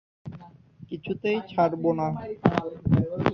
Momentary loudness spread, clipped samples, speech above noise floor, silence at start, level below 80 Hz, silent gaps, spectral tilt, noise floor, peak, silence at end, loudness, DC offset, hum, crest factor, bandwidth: 19 LU; under 0.1%; 23 dB; 0.25 s; -48 dBFS; none; -9 dB/octave; -48 dBFS; -2 dBFS; 0 s; -26 LUFS; under 0.1%; none; 24 dB; 6.8 kHz